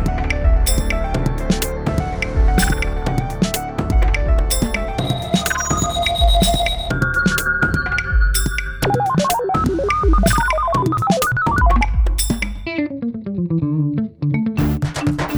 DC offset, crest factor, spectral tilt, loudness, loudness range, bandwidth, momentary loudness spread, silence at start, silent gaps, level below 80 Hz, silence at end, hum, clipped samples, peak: under 0.1%; 14 dB; -4.5 dB/octave; -18 LUFS; 3 LU; over 20 kHz; 6 LU; 0 s; none; -20 dBFS; 0 s; none; under 0.1%; -2 dBFS